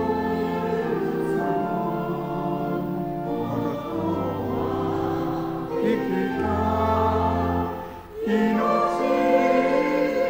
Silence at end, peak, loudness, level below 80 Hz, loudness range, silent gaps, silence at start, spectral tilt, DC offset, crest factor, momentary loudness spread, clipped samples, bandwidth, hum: 0 s; -8 dBFS; -24 LUFS; -50 dBFS; 5 LU; none; 0 s; -7.5 dB/octave; under 0.1%; 16 dB; 7 LU; under 0.1%; 16 kHz; none